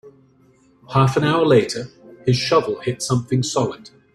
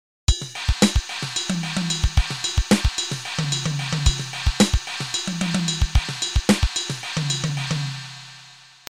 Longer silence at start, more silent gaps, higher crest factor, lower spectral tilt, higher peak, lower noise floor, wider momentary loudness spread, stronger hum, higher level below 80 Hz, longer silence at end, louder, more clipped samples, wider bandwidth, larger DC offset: second, 0.05 s vs 0.3 s; neither; about the same, 18 dB vs 20 dB; first, -5.5 dB/octave vs -4 dB/octave; about the same, -2 dBFS vs -4 dBFS; first, -55 dBFS vs -47 dBFS; first, 11 LU vs 6 LU; neither; second, -54 dBFS vs -28 dBFS; about the same, 0.25 s vs 0.3 s; first, -19 LUFS vs -23 LUFS; neither; second, 12.5 kHz vs 16 kHz; second, under 0.1% vs 0.2%